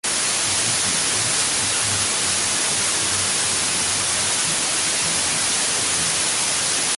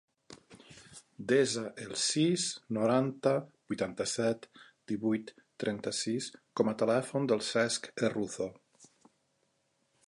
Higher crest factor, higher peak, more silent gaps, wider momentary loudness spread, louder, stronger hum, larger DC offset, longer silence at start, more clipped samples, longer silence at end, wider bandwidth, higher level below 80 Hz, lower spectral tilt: second, 14 dB vs 20 dB; first, -6 dBFS vs -14 dBFS; neither; second, 1 LU vs 12 LU; first, -18 LUFS vs -32 LUFS; neither; neither; second, 0.05 s vs 0.3 s; neither; second, 0 s vs 1.25 s; about the same, 12 kHz vs 11.5 kHz; first, -50 dBFS vs -74 dBFS; second, 0 dB/octave vs -4 dB/octave